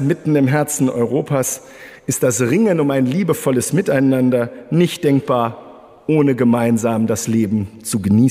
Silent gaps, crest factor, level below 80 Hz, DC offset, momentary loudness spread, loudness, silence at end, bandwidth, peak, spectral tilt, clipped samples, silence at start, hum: none; 12 dB; -56 dBFS; under 0.1%; 7 LU; -17 LUFS; 0 s; 16 kHz; -4 dBFS; -6 dB/octave; under 0.1%; 0 s; none